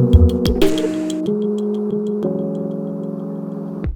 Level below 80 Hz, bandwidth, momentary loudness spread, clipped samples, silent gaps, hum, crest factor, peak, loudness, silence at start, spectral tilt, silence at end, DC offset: -26 dBFS; 18.5 kHz; 11 LU; under 0.1%; none; none; 18 dB; 0 dBFS; -20 LUFS; 0 s; -7.5 dB/octave; 0 s; under 0.1%